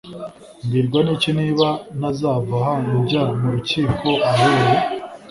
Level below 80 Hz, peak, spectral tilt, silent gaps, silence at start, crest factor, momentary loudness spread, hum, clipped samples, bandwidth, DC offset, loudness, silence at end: -46 dBFS; -2 dBFS; -6.5 dB/octave; none; 0.05 s; 16 dB; 10 LU; none; under 0.1%; 11.5 kHz; under 0.1%; -19 LUFS; 0 s